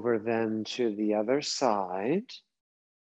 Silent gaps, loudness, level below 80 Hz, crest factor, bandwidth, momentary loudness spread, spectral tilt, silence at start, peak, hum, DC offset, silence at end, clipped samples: none; -29 LUFS; -82 dBFS; 18 dB; 8.6 kHz; 5 LU; -4.5 dB/octave; 0 s; -12 dBFS; none; under 0.1%; 0.75 s; under 0.1%